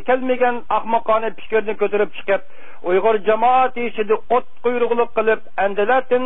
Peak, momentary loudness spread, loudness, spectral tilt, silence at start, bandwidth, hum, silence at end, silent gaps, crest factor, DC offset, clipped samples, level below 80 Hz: -2 dBFS; 6 LU; -19 LUFS; -9.5 dB/octave; 0.05 s; 3.9 kHz; none; 0 s; none; 16 dB; 6%; under 0.1%; -56 dBFS